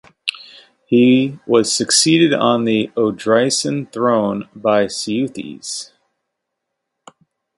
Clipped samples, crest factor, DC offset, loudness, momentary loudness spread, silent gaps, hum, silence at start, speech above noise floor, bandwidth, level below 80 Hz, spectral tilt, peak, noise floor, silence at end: under 0.1%; 18 dB; under 0.1%; -16 LUFS; 13 LU; none; none; 0.25 s; 61 dB; 11.5 kHz; -60 dBFS; -4 dB/octave; 0 dBFS; -77 dBFS; 1.75 s